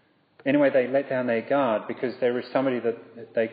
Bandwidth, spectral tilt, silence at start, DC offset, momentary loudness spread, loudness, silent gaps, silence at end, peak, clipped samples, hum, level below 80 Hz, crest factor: 5 kHz; -10 dB/octave; 0.45 s; under 0.1%; 10 LU; -25 LUFS; none; 0 s; -10 dBFS; under 0.1%; none; -86 dBFS; 16 dB